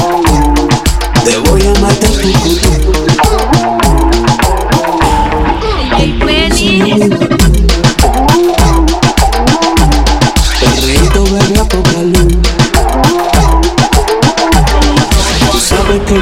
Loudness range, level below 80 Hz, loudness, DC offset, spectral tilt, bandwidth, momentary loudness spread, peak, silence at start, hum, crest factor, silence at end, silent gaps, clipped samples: 1 LU; -12 dBFS; -9 LUFS; under 0.1%; -4.5 dB/octave; 16.5 kHz; 2 LU; 0 dBFS; 0 s; none; 8 dB; 0 s; none; under 0.1%